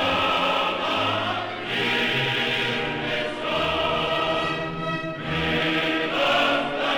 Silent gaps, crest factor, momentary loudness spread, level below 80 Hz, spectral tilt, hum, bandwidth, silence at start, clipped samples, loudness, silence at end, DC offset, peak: none; 14 dB; 6 LU; -50 dBFS; -4.5 dB/octave; none; 19.5 kHz; 0 s; under 0.1%; -23 LUFS; 0 s; 0.2%; -10 dBFS